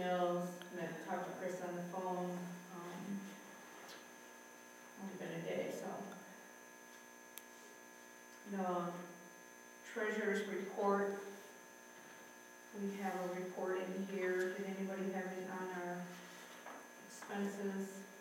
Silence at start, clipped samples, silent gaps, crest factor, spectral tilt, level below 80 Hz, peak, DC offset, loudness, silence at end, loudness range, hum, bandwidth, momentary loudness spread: 0 s; under 0.1%; none; 20 dB; -5.5 dB/octave; under -90 dBFS; -24 dBFS; under 0.1%; -43 LUFS; 0 s; 7 LU; none; 16.5 kHz; 18 LU